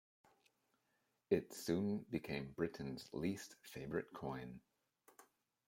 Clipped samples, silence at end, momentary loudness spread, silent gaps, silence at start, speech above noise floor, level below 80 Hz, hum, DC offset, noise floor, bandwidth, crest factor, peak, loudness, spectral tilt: under 0.1%; 0.45 s; 11 LU; none; 1.3 s; 41 dB; -72 dBFS; none; under 0.1%; -84 dBFS; 16.5 kHz; 24 dB; -22 dBFS; -44 LUFS; -6 dB/octave